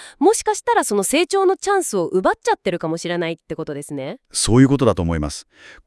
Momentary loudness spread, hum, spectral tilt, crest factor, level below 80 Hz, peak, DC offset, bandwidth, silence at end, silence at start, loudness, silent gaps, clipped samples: 14 LU; none; -5 dB/octave; 18 dB; -40 dBFS; 0 dBFS; under 0.1%; 12 kHz; 0.15 s; 0 s; -19 LUFS; none; under 0.1%